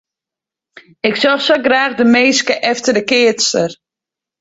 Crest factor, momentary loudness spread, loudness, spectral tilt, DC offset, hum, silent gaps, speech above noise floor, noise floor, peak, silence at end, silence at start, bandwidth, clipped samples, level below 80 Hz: 14 dB; 7 LU; -13 LUFS; -2.5 dB/octave; under 0.1%; none; none; 73 dB; -86 dBFS; 0 dBFS; 0.65 s; 1.05 s; 8 kHz; under 0.1%; -60 dBFS